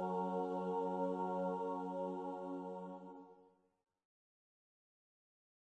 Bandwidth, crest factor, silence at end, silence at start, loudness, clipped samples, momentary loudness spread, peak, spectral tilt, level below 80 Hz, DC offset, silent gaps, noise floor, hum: 8.8 kHz; 14 dB; 2.3 s; 0 s; -42 LUFS; under 0.1%; 12 LU; -28 dBFS; -9 dB/octave; under -90 dBFS; under 0.1%; none; -70 dBFS; none